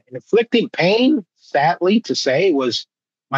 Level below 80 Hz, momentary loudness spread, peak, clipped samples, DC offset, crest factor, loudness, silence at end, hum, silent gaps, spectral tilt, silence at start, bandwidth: -82 dBFS; 7 LU; -4 dBFS; under 0.1%; under 0.1%; 14 dB; -17 LUFS; 0 s; none; none; -5 dB/octave; 0.1 s; 8 kHz